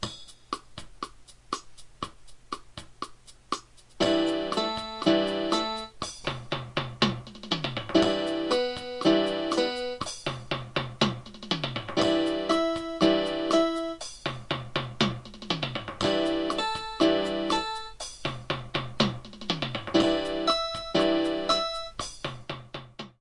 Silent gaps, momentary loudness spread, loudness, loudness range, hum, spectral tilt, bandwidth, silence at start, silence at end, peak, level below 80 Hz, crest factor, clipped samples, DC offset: none; 15 LU; -28 LUFS; 4 LU; none; -4.5 dB/octave; 11 kHz; 0 s; 0.1 s; -10 dBFS; -54 dBFS; 20 dB; under 0.1%; under 0.1%